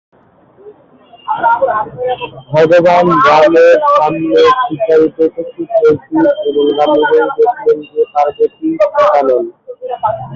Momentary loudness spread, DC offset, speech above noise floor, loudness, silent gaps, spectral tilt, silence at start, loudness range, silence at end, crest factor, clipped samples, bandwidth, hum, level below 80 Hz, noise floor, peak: 11 LU; under 0.1%; 35 dB; -11 LUFS; none; -6.5 dB/octave; 0.65 s; 3 LU; 0 s; 10 dB; under 0.1%; 7.4 kHz; none; -52 dBFS; -45 dBFS; 0 dBFS